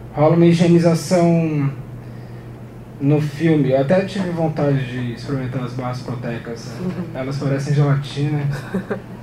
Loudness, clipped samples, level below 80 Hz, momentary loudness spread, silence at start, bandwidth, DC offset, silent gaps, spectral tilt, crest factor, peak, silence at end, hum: -19 LUFS; under 0.1%; -46 dBFS; 19 LU; 0 s; 12.5 kHz; under 0.1%; none; -7.5 dB/octave; 18 dB; -2 dBFS; 0 s; none